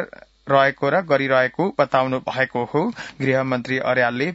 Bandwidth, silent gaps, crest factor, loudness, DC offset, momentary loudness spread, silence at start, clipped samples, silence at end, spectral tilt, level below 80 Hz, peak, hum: 8 kHz; none; 18 dB; -20 LUFS; under 0.1%; 6 LU; 0 s; under 0.1%; 0 s; -6.5 dB/octave; -60 dBFS; -2 dBFS; none